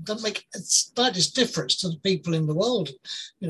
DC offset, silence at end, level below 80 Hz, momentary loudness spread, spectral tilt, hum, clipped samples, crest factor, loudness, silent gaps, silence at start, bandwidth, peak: under 0.1%; 0 s; -66 dBFS; 11 LU; -3 dB/octave; none; under 0.1%; 18 dB; -24 LUFS; none; 0 s; 13 kHz; -6 dBFS